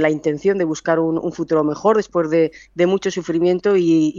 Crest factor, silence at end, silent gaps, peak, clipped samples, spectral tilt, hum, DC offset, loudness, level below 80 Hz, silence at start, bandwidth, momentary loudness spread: 14 dB; 0 s; none; -2 dBFS; under 0.1%; -6.5 dB/octave; none; under 0.1%; -18 LUFS; -56 dBFS; 0 s; 7.4 kHz; 5 LU